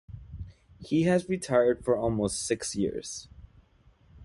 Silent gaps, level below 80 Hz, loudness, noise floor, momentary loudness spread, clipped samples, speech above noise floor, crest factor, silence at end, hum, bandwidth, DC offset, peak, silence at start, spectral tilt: none; -52 dBFS; -28 LUFS; -61 dBFS; 20 LU; under 0.1%; 34 dB; 20 dB; 0 s; none; 11.5 kHz; under 0.1%; -10 dBFS; 0.1 s; -5 dB/octave